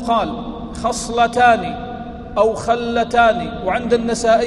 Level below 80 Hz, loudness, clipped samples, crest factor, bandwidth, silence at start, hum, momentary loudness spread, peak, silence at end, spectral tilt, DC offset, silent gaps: -38 dBFS; -17 LUFS; under 0.1%; 16 dB; 12 kHz; 0 s; none; 14 LU; -2 dBFS; 0 s; -4.5 dB/octave; under 0.1%; none